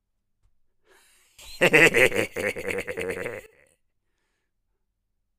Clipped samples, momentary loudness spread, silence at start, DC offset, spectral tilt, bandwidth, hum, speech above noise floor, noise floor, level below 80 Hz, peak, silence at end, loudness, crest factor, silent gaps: under 0.1%; 17 LU; 1.4 s; under 0.1%; -3.5 dB/octave; 15.5 kHz; none; 55 dB; -76 dBFS; -52 dBFS; -2 dBFS; 2 s; -21 LUFS; 26 dB; none